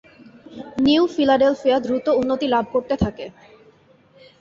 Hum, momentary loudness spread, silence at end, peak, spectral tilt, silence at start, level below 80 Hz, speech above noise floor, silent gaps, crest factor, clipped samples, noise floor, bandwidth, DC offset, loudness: none; 16 LU; 1.1 s; -6 dBFS; -6.5 dB/octave; 0.5 s; -46 dBFS; 35 dB; none; 16 dB; under 0.1%; -53 dBFS; 7.6 kHz; under 0.1%; -19 LUFS